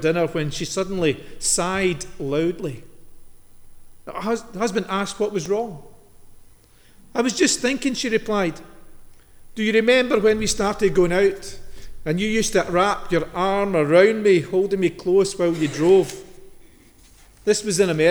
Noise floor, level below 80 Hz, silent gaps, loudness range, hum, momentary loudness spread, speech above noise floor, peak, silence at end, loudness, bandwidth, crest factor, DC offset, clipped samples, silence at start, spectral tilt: -50 dBFS; -44 dBFS; none; 8 LU; none; 13 LU; 30 dB; -4 dBFS; 0 s; -21 LUFS; over 20 kHz; 18 dB; under 0.1%; under 0.1%; 0 s; -4 dB/octave